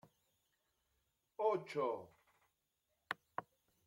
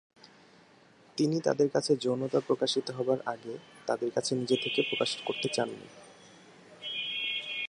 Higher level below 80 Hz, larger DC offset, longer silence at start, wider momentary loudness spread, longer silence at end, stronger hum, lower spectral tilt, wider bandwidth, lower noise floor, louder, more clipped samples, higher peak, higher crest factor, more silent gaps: second, -88 dBFS vs -78 dBFS; neither; first, 1.4 s vs 1.15 s; about the same, 12 LU vs 12 LU; first, 0.45 s vs 0 s; neither; first, -5.5 dB/octave vs -4 dB/octave; first, 16.5 kHz vs 11.5 kHz; first, -86 dBFS vs -59 dBFS; second, -42 LUFS vs -30 LUFS; neither; second, -22 dBFS vs -12 dBFS; about the same, 24 dB vs 20 dB; neither